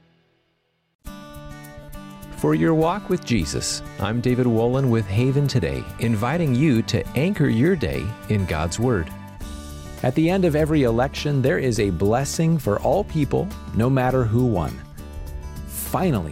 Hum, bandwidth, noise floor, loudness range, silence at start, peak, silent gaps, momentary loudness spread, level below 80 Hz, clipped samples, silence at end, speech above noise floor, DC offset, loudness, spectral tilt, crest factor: none; 16.5 kHz; -69 dBFS; 3 LU; 1.05 s; -8 dBFS; none; 18 LU; -38 dBFS; under 0.1%; 0 s; 48 dB; under 0.1%; -21 LUFS; -6.5 dB/octave; 14 dB